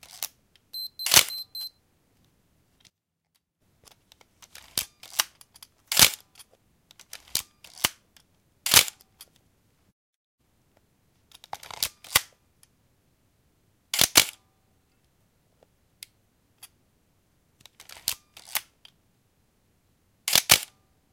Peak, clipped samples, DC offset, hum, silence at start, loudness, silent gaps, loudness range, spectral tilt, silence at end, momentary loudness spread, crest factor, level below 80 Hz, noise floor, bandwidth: 0 dBFS; under 0.1%; under 0.1%; none; 0.15 s; -23 LUFS; 9.92-10.38 s; 13 LU; 0.5 dB/octave; 0.5 s; 22 LU; 30 dB; -60 dBFS; -76 dBFS; 17 kHz